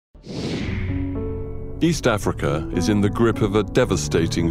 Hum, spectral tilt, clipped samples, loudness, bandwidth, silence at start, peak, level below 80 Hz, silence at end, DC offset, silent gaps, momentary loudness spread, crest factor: none; -6 dB/octave; under 0.1%; -22 LUFS; 16 kHz; 0.15 s; -6 dBFS; -34 dBFS; 0 s; under 0.1%; none; 10 LU; 16 dB